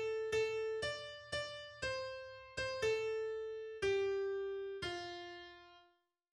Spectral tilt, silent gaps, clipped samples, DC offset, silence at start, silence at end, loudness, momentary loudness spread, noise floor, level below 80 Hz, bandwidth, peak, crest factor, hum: -3.5 dB/octave; none; under 0.1%; under 0.1%; 0 s; 0.5 s; -40 LUFS; 11 LU; -75 dBFS; -66 dBFS; 12 kHz; -26 dBFS; 14 dB; none